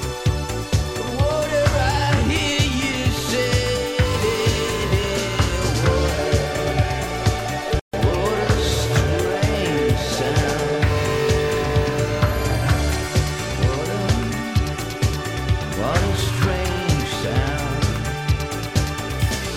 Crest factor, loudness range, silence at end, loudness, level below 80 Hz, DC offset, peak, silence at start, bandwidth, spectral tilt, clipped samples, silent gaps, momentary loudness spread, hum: 16 dB; 2 LU; 0 s; -21 LUFS; -28 dBFS; under 0.1%; -4 dBFS; 0 s; 16.5 kHz; -5 dB/octave; under 0.1%; 7.81-7.91 s; 4 LU; none